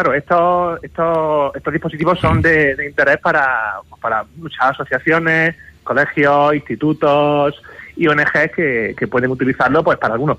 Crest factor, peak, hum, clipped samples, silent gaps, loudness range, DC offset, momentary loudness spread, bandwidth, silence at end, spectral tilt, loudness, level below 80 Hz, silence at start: 12 dB; -4 dBFS; none; under 0.1%; none; 1 LU; under 0.1%; 8 LU; 10.5 kHz; 0 s; -7.5 dB/octave; -15 LUFS; -42 dBFS; 0 s